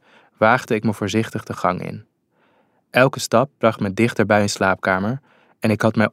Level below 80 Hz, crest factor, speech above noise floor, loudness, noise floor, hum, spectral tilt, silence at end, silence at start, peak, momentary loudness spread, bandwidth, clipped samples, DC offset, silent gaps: -62 dBFS; 18 dB; 42 dB; -19 LUFS; -61 dBFS; none; -5.5 dB/octave; 0.05 s; 0.4 s; -2 dBFS; 10 LU; 15.5 kHz; under 0.1%; under 0.1%; none